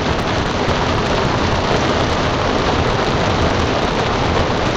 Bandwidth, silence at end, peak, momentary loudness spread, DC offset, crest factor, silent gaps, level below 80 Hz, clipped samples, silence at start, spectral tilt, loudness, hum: 10 kHz; 0 s; -4 dBFS; 1 LU; under 0.1%; 12 dB; none; -28 dBFS; under 0.1%; 0 s; -5 dB/octave; -17 LUFS; none